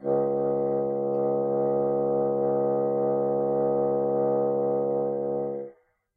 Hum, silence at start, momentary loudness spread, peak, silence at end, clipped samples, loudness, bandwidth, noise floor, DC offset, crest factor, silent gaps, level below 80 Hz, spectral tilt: none; 0 s; 4 LU; -14 dBFS; 0.45 s; under 0.1%; -26 LUFS; 2.2 kHz; -51 dBFS; under 0.1%; 12 dB; none; -74 dBFS; -13.5 dB/octave